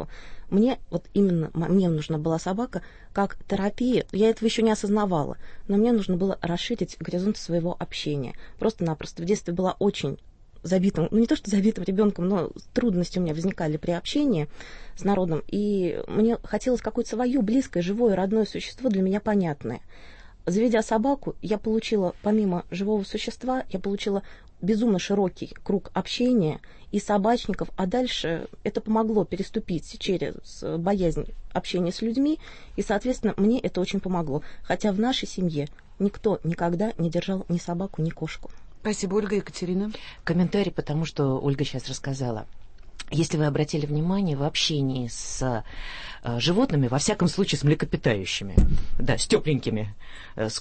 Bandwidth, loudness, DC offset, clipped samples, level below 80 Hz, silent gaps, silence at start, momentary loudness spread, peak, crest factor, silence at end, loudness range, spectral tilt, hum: 8.8 kHz; -26 LUFS; under 0.1%; under 0.1%; -40 dBFS; none; 0 s; 9 LU; -4 dBFS; 20 dB; 0 s; 3 LU; -6 dB/octave; none